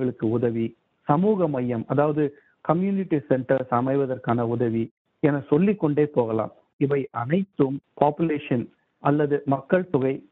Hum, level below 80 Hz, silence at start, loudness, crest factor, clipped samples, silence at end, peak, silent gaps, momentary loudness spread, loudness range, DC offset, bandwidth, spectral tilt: none; -62 dBFS; 0 s; -24 LUFS; 22 dB; under 0.1%; 0.1 s; -2 dBFS; 4.91-5.05 s, 6.73-6.79 s; 7 LU; 1 LU; under 0.1%; 4.1 kHz; -11.5 dB/octave